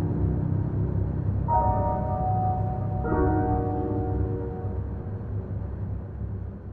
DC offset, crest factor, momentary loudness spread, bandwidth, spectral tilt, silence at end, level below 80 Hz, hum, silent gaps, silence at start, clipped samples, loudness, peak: under 0.1%; 14 dB; 10 LU; 2.6 kHz; -13 dB/octave; 0 s; -34 dBFS; none; none; 0 s; under 0.1%; -28 LUFS; -12 dBFS